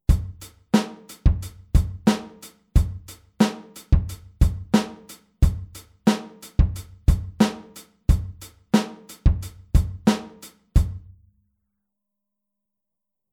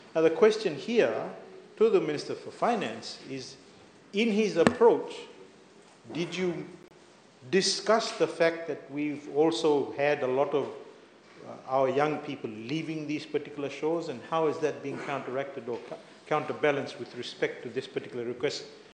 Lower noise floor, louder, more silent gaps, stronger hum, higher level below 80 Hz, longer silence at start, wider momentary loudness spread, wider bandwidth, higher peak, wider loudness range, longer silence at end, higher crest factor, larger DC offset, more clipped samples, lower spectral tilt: first, -85 dBFS vs -56 dBFS; first, -24 LUFS vs -29 LUFS; neither; neither; first, -26 dBFS vs -72 dBFS; about the same, 0.1 s vs 0 s; about the same, 17 LU vs 16 LU; first, 16 kHz vs 9.6 kHz; about the same, -4 dBFS vs -2 dBFS; about the same, 3 LU vs 5 LU; first, 2.35 s vs 0.1 s; second, 20 dB vs 28 dB; neither; neither; first, -6.5 dB/octave vs -4.5 dB/octave